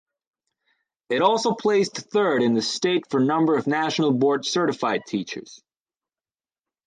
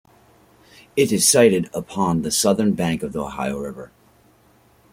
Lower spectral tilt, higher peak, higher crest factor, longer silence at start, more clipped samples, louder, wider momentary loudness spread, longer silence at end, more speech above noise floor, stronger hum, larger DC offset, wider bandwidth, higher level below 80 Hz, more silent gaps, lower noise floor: about the same, -4.5 dB/octave vs -4 dB/octave; second, -6 dBFS vs -2 dBFS; about the same, 18 dB vs 20 dB; first, 1.1 s vs 0.95 s; neither; second, -22 LUFS vs -19 LUFS; second, 7 LU vs 14 LU; first, 1.3 s vs 1.05 s; first, over 68 dB vs 36 dB; neither; neither; second, 9.6 kHz vs 16.5 kHz; second, -72 dBFS vs -52 dBFS; neither; first, under -90 dBFS vs -56 dBFS